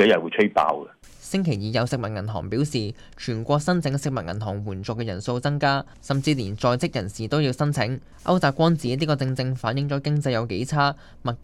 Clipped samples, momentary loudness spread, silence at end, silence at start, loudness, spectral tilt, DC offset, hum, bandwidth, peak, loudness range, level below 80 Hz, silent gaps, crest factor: under 0.1%; 9 LU; 0 s; 0 s; -24 LUFS; -6 dB/octave; under 0.1%; none; 12.5 kHz; -6 dBFS; 3 LU; -50 dBFS; none; 18 dB